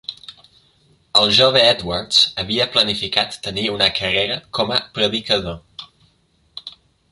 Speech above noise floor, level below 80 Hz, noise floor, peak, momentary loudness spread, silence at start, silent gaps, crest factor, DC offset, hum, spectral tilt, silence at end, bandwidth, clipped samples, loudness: 42 dB; -48 dBFS; -60 dBFS; 0 dBFS; 23 LU; 0.1 s; none; 20 dB; under 0.1%; none; -3 dB/octave; 0.4 s; 11.5 kHz; under 0.1%; -16 LUFS